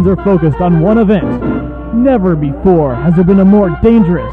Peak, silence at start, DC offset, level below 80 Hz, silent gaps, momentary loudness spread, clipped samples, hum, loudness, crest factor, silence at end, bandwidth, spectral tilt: 0 dBFS; 0 s; under 0.1%; -26 dBFS; none; 8 LU; under 0.1%; none; -10 LUFS; 10 dB; 0 s; 4 kHz; -11 dB/octave